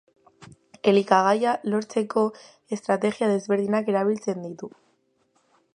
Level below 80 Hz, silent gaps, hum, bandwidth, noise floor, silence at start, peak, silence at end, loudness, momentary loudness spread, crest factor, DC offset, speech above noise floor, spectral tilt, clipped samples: -74 dBFS; none; none; 10.5 kHz; -68 dBFS; 0.4 s; -4 dBFS; 1.1 s; -24 LUFS; 14 LU; 22 dB; under 0.1%; 45 dB; -6 dB/octave; under 0.1%